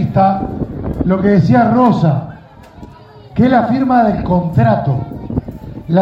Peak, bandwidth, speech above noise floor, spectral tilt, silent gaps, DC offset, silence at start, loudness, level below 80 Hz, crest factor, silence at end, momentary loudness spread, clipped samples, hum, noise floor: 0 dBFS; 7.2 kHz; 26 dB; -10 dB/octave; none; under 0.1%; 0 s; -14 LUFS; -34 dBFS; 14 dB; 0 s; 12 LU; under 0.1%; none; -37 dBFS